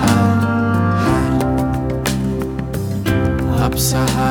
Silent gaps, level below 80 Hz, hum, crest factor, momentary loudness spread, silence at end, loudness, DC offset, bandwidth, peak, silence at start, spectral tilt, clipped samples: none; -28 dBFS; none; 14 dB; 6 LU; 0 s; -17 LUFS; under 0.1%; 19.5 kHz; -2 dBFS; 0 s; -6 dB/octave; under 0.1%